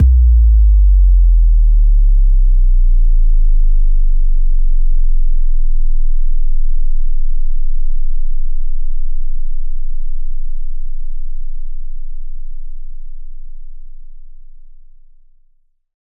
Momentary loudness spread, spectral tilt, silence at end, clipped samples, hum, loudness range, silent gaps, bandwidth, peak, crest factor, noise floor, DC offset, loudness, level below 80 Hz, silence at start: 21 LU; -22 dB/octave; 1.65 s; under 0.1%; none; 20 LU; none; 0.2 kHz; -2 dBFS; 6 dB; -53 dBFS; under 0.1%; -18 LUFS; -10 dBFS; 0 s